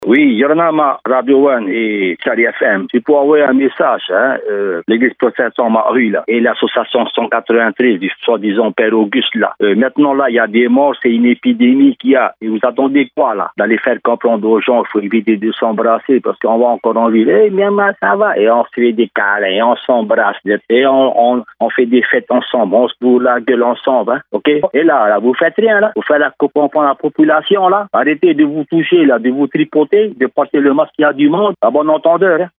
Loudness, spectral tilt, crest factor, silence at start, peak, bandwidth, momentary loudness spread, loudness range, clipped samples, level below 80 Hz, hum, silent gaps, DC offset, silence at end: -12 LUFS; -9 dB/octave; 12 dB; 0 s; 0 dBFS; 3.9 kHz; 5 LU; 2 LU; under 0.1%; -70 dBFS; none; none; under 0.1%; 0.1 s